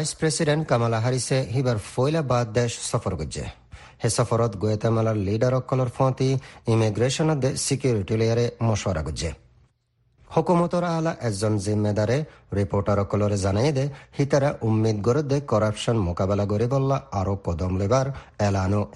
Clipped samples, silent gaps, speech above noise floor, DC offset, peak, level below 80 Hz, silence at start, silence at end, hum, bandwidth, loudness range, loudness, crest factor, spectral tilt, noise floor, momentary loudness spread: under 0.1%; none; 44 dB; under 0.1%; -6 dBFS; -46 dBFS; 0 s; 0.05 s; none; 11.5 kHz; 2 LU; -24 LUFS; 18 dB; -6 dB/octave; -67 dBFS; 5 LU